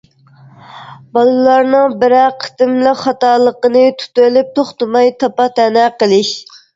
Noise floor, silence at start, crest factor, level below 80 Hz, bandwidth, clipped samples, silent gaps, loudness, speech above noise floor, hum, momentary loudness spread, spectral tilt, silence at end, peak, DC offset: -43 dBFS; 0.75 s; 12 dB; -60 dBFS; 7.8 kHz; under 0.1%; none; -12 LUFS; 32 dB; none; 5 LU; -4.5 dB/octave; 0.35 s; 0 dBFS; under 0.1%